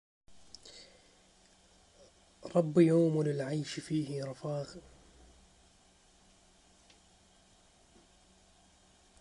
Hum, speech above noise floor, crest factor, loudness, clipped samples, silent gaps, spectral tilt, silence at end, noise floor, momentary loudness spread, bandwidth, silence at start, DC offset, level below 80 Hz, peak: none; 34 dB; 24 dB; -32 LUFS; under 0.1%; none; -7 dB/octave; 4.4 s; -65 dBFS; 27 LU; 11 kHz; 0.3 s; under 0.1%; -70 dBFS; -14 dBFS